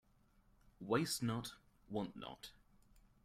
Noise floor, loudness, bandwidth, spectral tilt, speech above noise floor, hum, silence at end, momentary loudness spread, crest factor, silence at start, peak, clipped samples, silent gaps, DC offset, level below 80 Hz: -72 dBFS; -42 LUFS; 16 kHz; -4.5 dB/octave; 31 dB; none; 0.75 s; 18 LU; 22 dB; 0.8 s; -22 dBFS; under 0.1%; none; under 0.1%; -70 dBFS